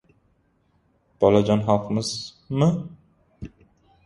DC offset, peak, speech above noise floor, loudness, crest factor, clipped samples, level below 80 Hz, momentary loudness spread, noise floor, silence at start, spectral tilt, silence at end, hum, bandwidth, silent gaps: under 0.1%; -2 dBFS; 44 dB; -22 LUFS; 22 dB; under 0.1%; -52 dBFS; 24 LU; -65 dBFS; 1.2 s; -6.5 dB/octave; 0.6 s; none; 11.5 kHz; none